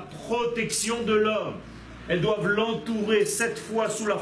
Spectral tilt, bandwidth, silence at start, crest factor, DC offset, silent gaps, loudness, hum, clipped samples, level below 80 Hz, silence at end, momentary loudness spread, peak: -4 dB/octave; 11 kHz; 0 s; 14 dB; under 0.1%; none; -26 LUFS; none; under 0.1%; -54 dBFS; 0 s; 8 LU; -12 dBFS